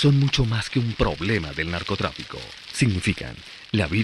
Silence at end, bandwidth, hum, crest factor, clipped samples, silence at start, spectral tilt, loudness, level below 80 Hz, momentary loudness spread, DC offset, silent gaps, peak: 0 s; 11.5 kHz; none; 16 dB; under 0.1%; 0 s; -5.5 dB/octave; -24 LUFS; -38 dBFS; 14 LU; under 0.1%; none; -6 dBFS